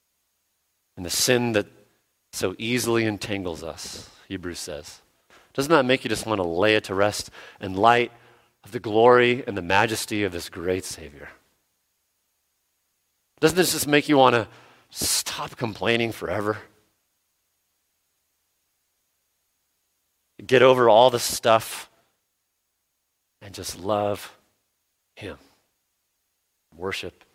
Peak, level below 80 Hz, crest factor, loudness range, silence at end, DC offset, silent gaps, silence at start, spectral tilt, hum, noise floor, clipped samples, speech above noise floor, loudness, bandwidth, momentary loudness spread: -2 dBFS; -58 dBFS; 24 dB; 12 LU; 0.25 s; under 0.1%; none; 0.95 s; -3.5 dB/octave; none; -76 dBFS; under 0.1%; 53 dB; -22 LUFS; 16.5 kHz; 20 LU